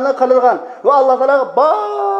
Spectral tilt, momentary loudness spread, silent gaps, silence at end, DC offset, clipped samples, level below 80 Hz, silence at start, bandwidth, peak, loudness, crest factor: -5 dB/octave; 4 LU; none; 0 s; under 0.1%; under 0.1%; -72 dBFS; 0 s; 7.4 kHz; 0 dBFS; -13 LUFS; 12 dB